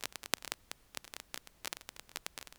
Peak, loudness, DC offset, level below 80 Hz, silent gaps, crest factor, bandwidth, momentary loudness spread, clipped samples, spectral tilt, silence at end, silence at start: -2 dBFS; -43 LUFS; under 0.1%; -70 dBFS; none; 44 dB; over 20 kHz; 9 LU; under 0.1%; 0 dB/octave; 0.05 s; 0 s